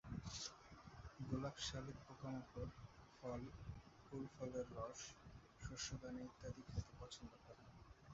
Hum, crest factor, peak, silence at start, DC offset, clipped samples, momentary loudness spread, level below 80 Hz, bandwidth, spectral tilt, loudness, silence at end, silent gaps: none; 22 dB; -30 dBFS; 0.05 s; under 0.1%; under 0.1%; 14 LU; -64 dBFS; 7.6 kHz; -5 dB/octave; -52 LUFS; 0 s; none